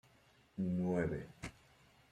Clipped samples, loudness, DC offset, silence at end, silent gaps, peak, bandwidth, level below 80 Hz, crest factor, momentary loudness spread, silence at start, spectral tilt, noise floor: under 0.1%; -39 LUFS; under 0.1%; 0.6 s; none; -22 dBFS; 11 kHz; -64 dBFS; 20 dB; 15 LU; 0.55 s; -8 dB/octave; -69 dBFS